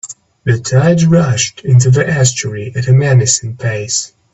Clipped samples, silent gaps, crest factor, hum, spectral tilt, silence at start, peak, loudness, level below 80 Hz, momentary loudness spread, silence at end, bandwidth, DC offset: under 0.1%; none; 12 dB; none; -5 dB/octave; 0.05 s; 0 dBFS; -12 LUFS; -44 dBFS; 10 LU; 0.25 s; 8.4 kHz; 0.1%